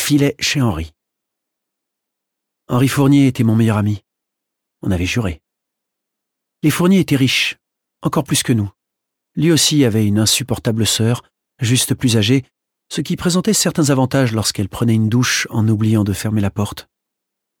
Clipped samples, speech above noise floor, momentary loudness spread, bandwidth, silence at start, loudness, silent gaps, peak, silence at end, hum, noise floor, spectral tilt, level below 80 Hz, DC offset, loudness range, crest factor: under 0.1%; 64 dB; 12 LU; 18.5 kHz; 0 s; -16 LUFS; none; -2 dBFS; 0.8 s; none; -80 dBFS; -4.5 dB/octave; -44 dBFS; under 0.1%; 3 LU; 14 dB